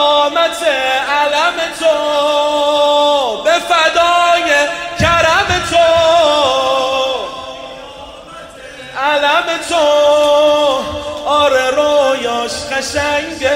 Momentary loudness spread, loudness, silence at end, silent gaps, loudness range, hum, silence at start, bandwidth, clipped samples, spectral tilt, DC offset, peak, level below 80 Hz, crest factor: 16 LU; -12 LUFS; 0 s; none; 5 LU; none; 0 s; 16 kHz; under 0.1%; -2.5 dB/octave; under 0.1%; 0 dBFS; -40 dBFS; 12 dB